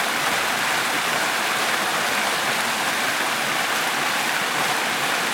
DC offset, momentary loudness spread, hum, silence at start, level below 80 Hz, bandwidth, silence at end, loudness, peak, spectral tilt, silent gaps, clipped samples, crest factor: under 0.1%; 1 LU; none; 0 s; -64 dBFS; 18 kHz; 0 s; -21 LUFS; -8 dBFS; -1 dB/octave; none; under 0.1%; 16 dB